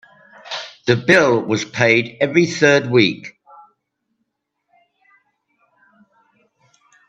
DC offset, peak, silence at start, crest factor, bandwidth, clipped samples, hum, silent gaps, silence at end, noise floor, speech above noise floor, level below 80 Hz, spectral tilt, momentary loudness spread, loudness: under 0.1%; 0 dBFS; 0.45 s; 20 dB; 8.8 kHz; under 0.1%; none; none; 3.8 s; -74 dBFS; 58 dB; -64 dBFS; -5 dB/octave; 16 LU; -16 LUFS